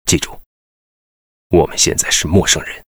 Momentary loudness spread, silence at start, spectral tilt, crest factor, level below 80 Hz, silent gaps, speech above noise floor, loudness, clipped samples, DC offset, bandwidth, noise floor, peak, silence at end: 5 LU; 0.05 s; -3 dB/octave; 16 dB; -34 dBFS; 0.46-1.50 s; over 75 dB; -14 LUFS; under 0.1%; under 0.1%; over 20 kHz; under -90 dBFS; 0 dBFS; 0.1 s